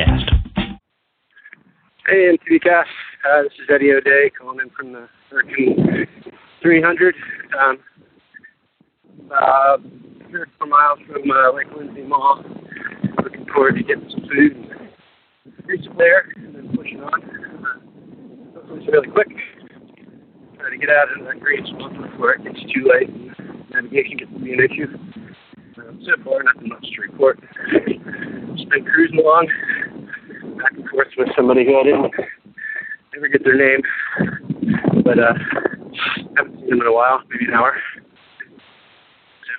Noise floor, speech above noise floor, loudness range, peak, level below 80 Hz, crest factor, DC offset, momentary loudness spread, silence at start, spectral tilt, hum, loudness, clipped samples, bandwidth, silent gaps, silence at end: -69 dBFS; 53 dB; 4 LU; -2 dBFS; -38 dBFS; 18 dB; under 0.1%; 18 LU; 0 s; -10 dB/octave; none; -17 LUFS; under 0.1%; 4.5 kHz; none; 0 s